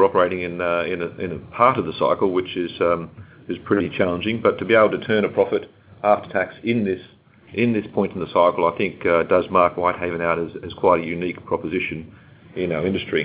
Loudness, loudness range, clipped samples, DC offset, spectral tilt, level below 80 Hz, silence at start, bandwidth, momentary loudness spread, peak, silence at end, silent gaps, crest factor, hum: -21 LUFS; 2 LU; under 0.1%; under 0.1%; -10 dB/octave; -50 dBFS; 0 s; 4 kHz; 10 LU; 0 dBFS; 0 s; none; 20 dB; none